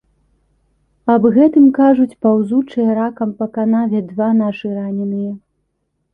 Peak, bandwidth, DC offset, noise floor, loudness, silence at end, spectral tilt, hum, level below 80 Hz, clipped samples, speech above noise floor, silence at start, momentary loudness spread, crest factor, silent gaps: -2 dBFS; 3.7 kHz; under 0.1%; -69 dBFS; -15 LUFS; 0.75 s; -10 dB/octave; none; -58 dBFS; under 0.1%; 55 dB; 1.05 s; 12 LU; 14 dB; none